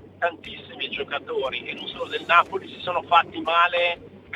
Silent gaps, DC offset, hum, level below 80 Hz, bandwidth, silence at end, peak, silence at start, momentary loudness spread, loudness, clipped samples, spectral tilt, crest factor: none; under 0.1%; none; -62 dBFS; 10.5 kHz; 0 s; -2 dBFS; 0 s; 13 LU; -23 LUFS; under 0.1%; -4 dB/octave; 22 dB